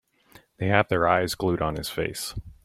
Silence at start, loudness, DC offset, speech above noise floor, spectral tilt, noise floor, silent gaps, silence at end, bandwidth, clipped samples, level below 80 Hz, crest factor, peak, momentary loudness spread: 0.6 s; -25 LUFS; under 0.1%; 31 dB; -5 dB/octave; -56 dBFS; none; 0.1 s; 16.5 kHz; under 0.1%; -48 dBFS; 24 dB; -4 dBFS; 10 LU